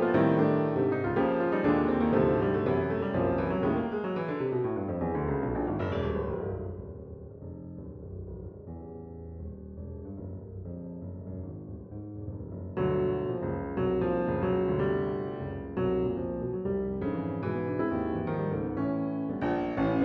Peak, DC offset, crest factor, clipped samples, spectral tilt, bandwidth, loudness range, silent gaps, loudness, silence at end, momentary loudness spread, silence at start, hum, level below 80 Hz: -12 dBFS; under 0.1%; 18 dB; under 0.1%; -10.5 dB/octave; 5.4 kHz; 15 LU; none; -30 LUFS; 0 s; 17 LU; 0 s; none; -48 dBFS